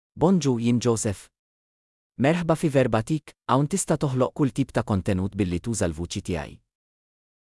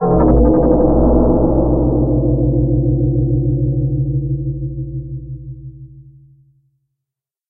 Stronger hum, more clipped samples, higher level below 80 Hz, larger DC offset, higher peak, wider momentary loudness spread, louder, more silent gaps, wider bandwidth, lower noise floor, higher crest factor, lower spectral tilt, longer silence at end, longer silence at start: neither; neither; second, -50 dBFS vs -22 dBFS; neither; second, -6 dBFS vs 0 dBFS; second, 8 LU vs 17 LU; second, -24 LUFS vs -15 LUFS; first, 1.39-2.10 s vs none; first, 12 kHz vs 1.9 kHz; first, under -90 dBFS vs -83 dBFS; about the same, 18 dB vs 14 dB; second, -6 dB/octave vs -17 dB/octave; second, 0.9 s vs 1.5 s; first, 0.15 s vs 0 s